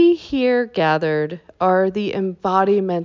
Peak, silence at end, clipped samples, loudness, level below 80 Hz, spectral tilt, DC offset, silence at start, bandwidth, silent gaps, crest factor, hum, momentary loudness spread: -4 dBFS; 0 s; under 0.1%; -19 LUFS; -56 dBFS; -7.5 dB/octave; under 0.1%; 0 s; 7 kHz; none; 14 dB; none; 6 LU